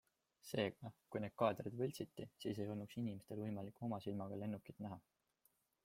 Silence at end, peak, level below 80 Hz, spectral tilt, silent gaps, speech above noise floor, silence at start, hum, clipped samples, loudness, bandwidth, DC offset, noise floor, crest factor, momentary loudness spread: 0.85 s; -22 dBFS; -80 dBFS; -6.5 dB/octave; none; 36 dB; 0.45 s; none; under 0.1%; -46 LUFS; 16.5 kHz; under 0.1%; -81 dBFS; 24 dB; 12 LU